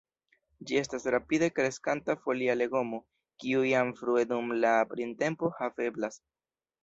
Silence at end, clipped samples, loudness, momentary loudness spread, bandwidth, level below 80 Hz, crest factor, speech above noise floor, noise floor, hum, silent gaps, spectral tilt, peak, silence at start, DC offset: 0.65 s; under 0.1%; -30 LUFS; 8 LU; 8 kHz; -70 dBFS; 18 dB; over 60 dB; under -90 dBFS; none; none; -5 dB/octave; -12 dBFS; 0.6 s; under 0.1%